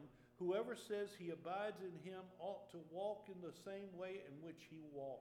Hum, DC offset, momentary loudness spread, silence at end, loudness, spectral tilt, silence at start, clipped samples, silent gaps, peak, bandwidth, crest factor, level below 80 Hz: none; under 0.1%; 12 LU; 0 s; -49 LUFS; -6 dB/octave; 0 s; under 0.1%; none; -32 dBFS; 17 kHz; 18 dB; -86 dBFS